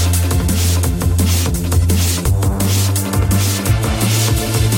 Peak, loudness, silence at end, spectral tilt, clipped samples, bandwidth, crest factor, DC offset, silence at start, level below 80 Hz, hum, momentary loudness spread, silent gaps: -2 dBFS; -15 LUFS; 0 s; -4.5 dB/octave; under 0.1%; 17 kHz; 12 dB; under 0.1%; 0 s; -22 dBFS; none; 2 LU; none